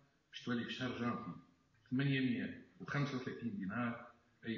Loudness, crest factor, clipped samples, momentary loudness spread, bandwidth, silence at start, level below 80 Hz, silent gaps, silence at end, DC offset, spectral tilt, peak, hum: -41 LUFS; 16 dB; under 0.1%; 15 LU; 7.2 kHz; 0.35 s; -74 dBFS; none; 0 s; under 0.1%; -5 dB/octave; -26 dBFS; none